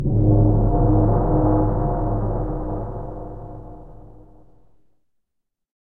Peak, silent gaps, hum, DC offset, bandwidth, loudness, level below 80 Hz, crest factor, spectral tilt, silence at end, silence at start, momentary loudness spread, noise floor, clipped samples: -6 dBFS; none; none; 1%; 1.9 kHz; -20 LUFS; -26 dBFS; 16 dB; -13.5 dB/octave; 0.1 s; 0 s; 19 LU; -77 dBFS; under 0.1%